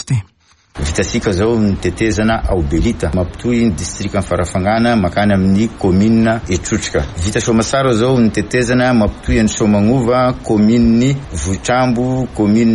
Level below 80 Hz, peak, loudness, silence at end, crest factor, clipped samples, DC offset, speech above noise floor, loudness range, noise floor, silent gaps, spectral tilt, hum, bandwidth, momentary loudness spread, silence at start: -28 dBFS; -4 dBFS; -14 LUFS; 0 s; 10 dB; under 0.1%; under 0.1%; 39 dB; 3 LU; -52 dBFS; none; -6 dB/octave; none; 11.5 kHz; 6 LU; 0 s